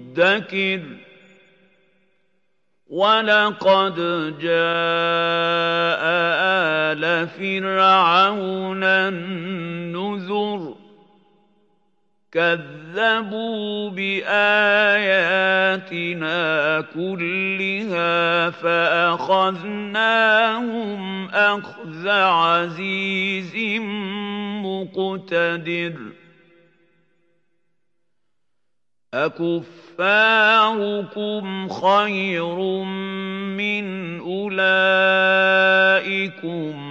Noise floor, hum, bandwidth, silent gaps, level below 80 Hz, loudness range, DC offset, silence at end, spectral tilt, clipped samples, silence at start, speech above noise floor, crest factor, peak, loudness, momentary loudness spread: -82 dBFS; none; 8 kHz; none; -80 dBFS; 9 LU; under 0.1%; 0 s; -5.5 dB/octave; under 0.1%; 0 s; 63 dB; 18 dB; -2 dBFS; -19 LUFS; 12 LU